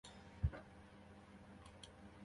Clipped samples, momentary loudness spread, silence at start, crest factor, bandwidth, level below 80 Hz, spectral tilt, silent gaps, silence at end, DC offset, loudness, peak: under 0.1%; 16 LU; 0.05 s; 26 dB; 11 kHz; -54 dBFS; -6.5 dB/octave; none; 0 s; under 0.1%; -52 LUFS; -26 dBFS